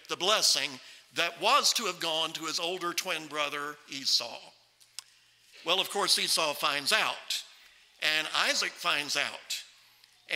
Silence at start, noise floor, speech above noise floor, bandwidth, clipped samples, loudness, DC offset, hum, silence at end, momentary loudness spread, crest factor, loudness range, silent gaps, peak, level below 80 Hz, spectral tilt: 0.1 s; -62 dBFS; 32 dB; 16 kHz; under 0.1%; -28 LUFS; under 0.1%; none; 0 s; 13 LU; 24 dB; 4 LU; none; -8 dBFS; -84 dBFS; 0 dB/octave